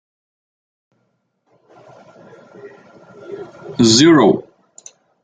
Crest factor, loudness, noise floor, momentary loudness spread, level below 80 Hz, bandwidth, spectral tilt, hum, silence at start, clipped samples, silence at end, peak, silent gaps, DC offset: 20 dB; -12 LUFS; -67 dBFS; 24 LU; -58 dBFS; 9.4 kHz; -4 dB/octave; none; 2.65 s; under 0.1%; 0.8 s; 0 dBFS; none; under 0.1%